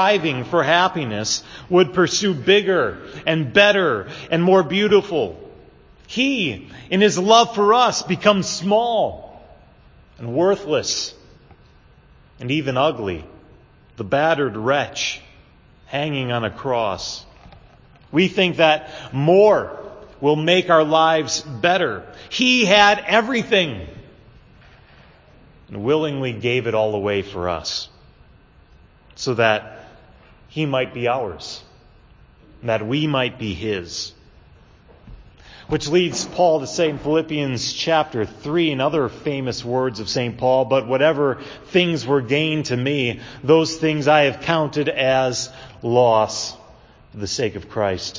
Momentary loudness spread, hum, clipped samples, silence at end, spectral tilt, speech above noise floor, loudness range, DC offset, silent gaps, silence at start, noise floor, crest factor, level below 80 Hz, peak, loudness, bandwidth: 13 LU; none; under 0.1%; 0 s; -4.5 dB/octave; 31 dB; 8 LU; under 0.1%; none; 0 s; -50 dBFS; 20 dB; -50 dBFS; 0 dBFS; -19 LUFS; 7.6 kHz